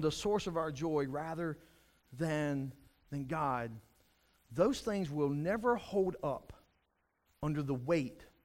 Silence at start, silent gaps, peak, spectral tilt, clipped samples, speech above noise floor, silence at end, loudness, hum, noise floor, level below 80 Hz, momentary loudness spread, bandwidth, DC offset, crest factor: 0 s; none; -18 dBFS; -6.5 dB/octave; under 0.1%; 44 dB; 0.2 s; -36 LUFS; none; -79 dBFS; -60 dBFS; 12 LU; 16 kHz; under 0.1%; 18 dB